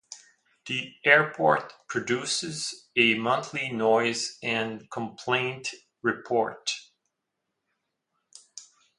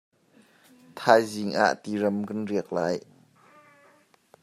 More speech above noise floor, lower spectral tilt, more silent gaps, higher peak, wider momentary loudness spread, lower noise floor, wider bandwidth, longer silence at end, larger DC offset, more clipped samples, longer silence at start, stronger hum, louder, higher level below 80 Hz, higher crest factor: first, 56 dB vs 36 dB; second, -3 dB/octave vs -5 dB/octave; neither; about the same, -4 dBFS vs -2 dBFS; first, 16 LU vs 10 LU; first, -82 dBFS vs -60 dBFS; second, 11.5 kHz vs 14.5 kHz; second, 0.35 s vs 1.4 s; neither; neither; second, 0.1 s vs 0.95 s; neither; about the same, -26 LUFS vs -26 LUFS; about the same, -74 dBFS vs -76 dBFS; about the same, 24 dB vs 26 dB